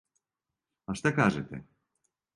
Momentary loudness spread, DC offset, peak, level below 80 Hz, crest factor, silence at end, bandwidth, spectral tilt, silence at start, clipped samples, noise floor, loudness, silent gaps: 20 LU; under 0.1%; -10 dBFS; -60 dBFS; 24 dB; 0.75 s; 11.5 kHz; -6 dB/octave; 0.9 s; under 0.1%; -89 dBFS; -29 LUFS; none